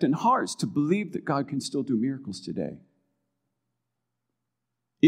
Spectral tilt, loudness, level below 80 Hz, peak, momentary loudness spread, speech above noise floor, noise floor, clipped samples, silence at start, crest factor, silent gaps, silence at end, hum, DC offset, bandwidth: -6 dB/octave; -28 LUFS; -74 dBFS; -6 dBFS; 11 LU; 57 dB; -84 dBFS; under 0.1%; 0 s; 22 dB; none; 0 s; none; under 0.1%; 14 kHz